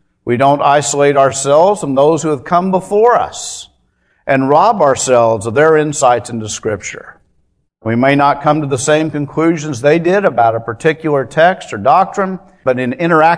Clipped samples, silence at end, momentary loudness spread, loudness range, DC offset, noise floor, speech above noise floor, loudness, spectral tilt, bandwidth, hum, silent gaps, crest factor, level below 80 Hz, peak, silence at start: 0.2%; 0 s; 10 LU; 3 LU; under 0.1%; -60 dBFS; 48 dB; -12 LUFS; -5 dB/octave; 11 kHz; none; none; 12 dB; -52 dBFS; 0 dBFS; 0.25 s